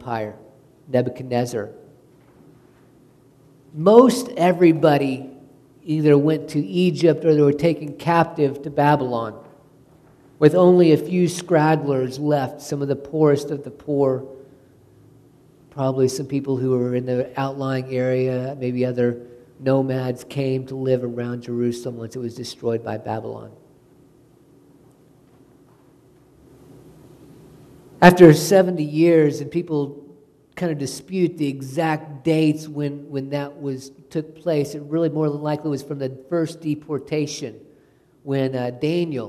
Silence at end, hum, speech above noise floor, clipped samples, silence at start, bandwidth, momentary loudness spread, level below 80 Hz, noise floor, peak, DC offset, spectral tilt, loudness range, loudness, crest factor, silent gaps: 0 s; none; 36 dB; under 0.1%; 0 s; 13.5 kHz; 15 LU; -58 dBFS; -55 dBFS; 0 dBFS; under 0.1%; -7 dB/octave; 10 LU; -20 LUFS; 20 dB; none